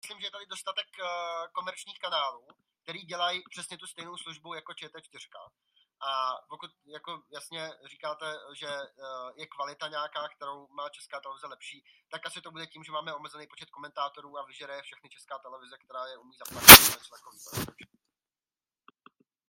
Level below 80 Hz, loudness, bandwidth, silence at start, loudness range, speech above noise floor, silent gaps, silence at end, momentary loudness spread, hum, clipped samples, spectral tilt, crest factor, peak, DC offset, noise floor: -54 dBFS; -18 LUFS; 15.5 kHz; 0.05 s; 23 LU; over 62 dB; none; 1.8 s; 12 LU; none; under 0.1%; -1 dB/octave; 28 dB; 0 dBFS; under 0.1%; under -90 dBFS